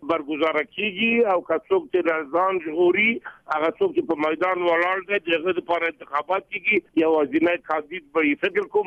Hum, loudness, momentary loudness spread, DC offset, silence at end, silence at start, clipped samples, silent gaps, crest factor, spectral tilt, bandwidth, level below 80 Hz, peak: none; -22 LUFS; 6 LU; under 0.1%; 0 s; 0 s; under 0.1%; none; 12 dB; -6.5 dB/octave; 6 kHz; -66 dBFS; -10 dBFS